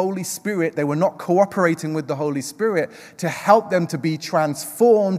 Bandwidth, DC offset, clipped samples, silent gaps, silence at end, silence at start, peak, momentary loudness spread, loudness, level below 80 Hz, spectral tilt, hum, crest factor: 16 kHz; under 0.1%; under 0.1%; none; 0 s; 0 s; -2 dBFS; 9 LU; -21 LUFS; -72 dBFS; -5.5 dB/octave; none; 18 dB